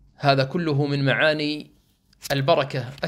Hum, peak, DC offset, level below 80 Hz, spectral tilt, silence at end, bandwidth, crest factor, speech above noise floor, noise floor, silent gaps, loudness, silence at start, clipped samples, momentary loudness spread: none; -4 dBFS; under 0.1%; -58 dBFS; -6 dB/octave; 0 s; 15 kHz; 20 dB; 37 dB; -59 dBFS; none; -22 LUFS; 0.2 s; under 0.1%; 9 LU